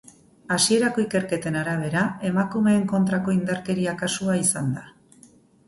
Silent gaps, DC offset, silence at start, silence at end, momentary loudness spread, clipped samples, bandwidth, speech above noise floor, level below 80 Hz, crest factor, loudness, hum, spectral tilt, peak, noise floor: none; under 0.1%; 0.5 s; 0.8 s; 6 LU; under 0.1%; 12 kHz; 31 dB; -60 dBFS; 18 dB; -23 LUFS; none; -4.5 dB/octave; -6 dBFS; -54 dBFS